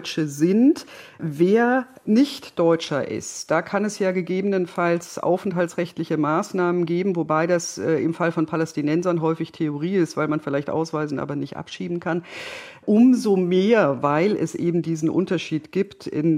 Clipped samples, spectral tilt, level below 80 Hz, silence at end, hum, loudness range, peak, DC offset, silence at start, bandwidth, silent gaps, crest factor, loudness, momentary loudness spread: under 0.1%; -6 dB/octave; -70 dBFS; 0 s; none; 4 LU; -6 dBFS; under 0.1%; 0 s; 16 kHz; none; 16 dB; -22 LUFS; 10 LU